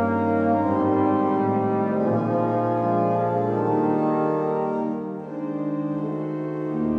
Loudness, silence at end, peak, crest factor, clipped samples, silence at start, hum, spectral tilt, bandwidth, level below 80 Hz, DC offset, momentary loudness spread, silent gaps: -23 LUFS; 0 s; -10 dBFS; 14 dB; under 0.1%; 0 s; none; -10.5 dB/octave; 5.2 kHz; -62 dBFS; under 0.1%; 7 LU; none